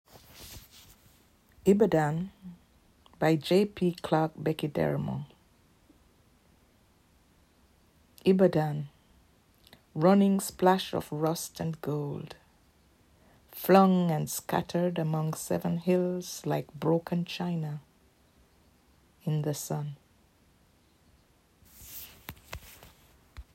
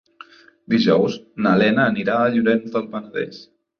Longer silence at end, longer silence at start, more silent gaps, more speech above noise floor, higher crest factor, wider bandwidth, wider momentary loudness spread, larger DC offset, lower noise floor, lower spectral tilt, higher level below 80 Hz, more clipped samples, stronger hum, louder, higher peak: second, 0.1 s vs 0.4 s; second, 0.15 s vs 0.7 s; neither; first, 37 dB vs 27 dB; first, 24 dB vs 16 dB; first, 16 kHz vs 6.6 kHz; first, 22 LU vs 12 LU; neither; first, -64 dBFS vs -46 dBFS; about the same, -6.5 dB/octave vs -7 dB/octave; about the same, -62 dBFS vs -60 dBFS; neither; neither; second, -28 LUFS vs -19 LUFS; second, -8 dBFS vs -4 dBFS